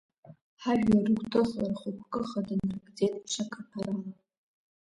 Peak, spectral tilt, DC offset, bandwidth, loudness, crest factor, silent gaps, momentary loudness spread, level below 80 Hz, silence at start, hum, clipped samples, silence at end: -12 dBFS; -6 dB/octave; under 0.1%; 11 kHz; -31 LUFS; 18 dB; 0.41-0.57 s; 12 LU; -60 dBFS; 0.3 s; none; under 0.1%; 0.85 s